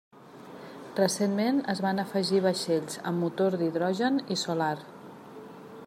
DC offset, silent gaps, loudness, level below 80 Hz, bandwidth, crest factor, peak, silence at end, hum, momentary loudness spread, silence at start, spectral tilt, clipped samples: under 0.1%; none; -28 LUFS; -76 dBFS; 15 kHz; 18 dB; -12 dBFS; 0 s; none; 20 LU; 0.15 s; -5 dB/octave; under 0.1%